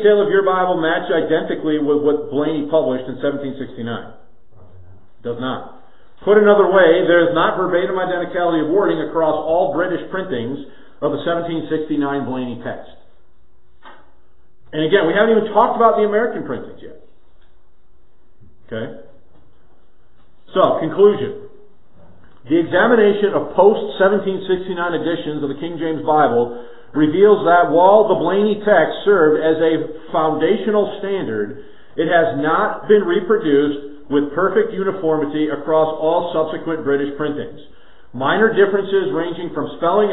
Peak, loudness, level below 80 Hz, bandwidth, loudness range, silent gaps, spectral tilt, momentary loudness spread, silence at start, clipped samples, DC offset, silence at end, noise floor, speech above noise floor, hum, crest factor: 0 dBFS; -17 LUFS; -56 dBFS; 4 kHz; 10 LU; none; -10 dB/octave; 14 LU; 0 s; under 0.1%; 2%; 0 s; -56 dBFS; 40 dB; none; 18 dB